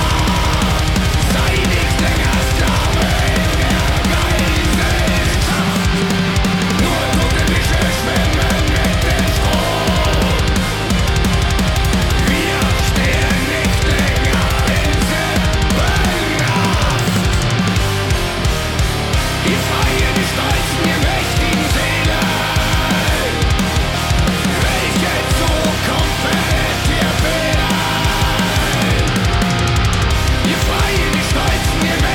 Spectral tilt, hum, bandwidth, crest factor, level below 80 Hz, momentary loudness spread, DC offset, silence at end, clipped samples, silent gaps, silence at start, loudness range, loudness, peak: -4.5 dB/octave; none; 18 kHz; 10 dB; -20 dBFS; 1 LU; under 0.1%; 0 s; under 0.1%; none; 0 s; 1 LU; -15 LUFS; -6 dBFS